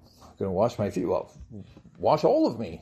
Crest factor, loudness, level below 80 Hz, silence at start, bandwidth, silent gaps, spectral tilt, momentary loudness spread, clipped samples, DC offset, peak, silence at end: 18 dB; -26 LUFS; -58 dBFS; 0.2 s; 13.5 kHz; none; -7.5 dB/octave; 23 LU; under 0.1%; under 0.1%; -8 dBFS; 0.05 s